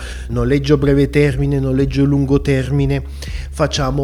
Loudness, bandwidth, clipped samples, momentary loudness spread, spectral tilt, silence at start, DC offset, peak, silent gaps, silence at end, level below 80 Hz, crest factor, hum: -16 LUFS; 12 kHz; under 0.1%; 9 LU; -7 dB/octave; 0 s; 0.1%; 0 dBFS; none; 0 s; -26 dBFS; 14 dB; none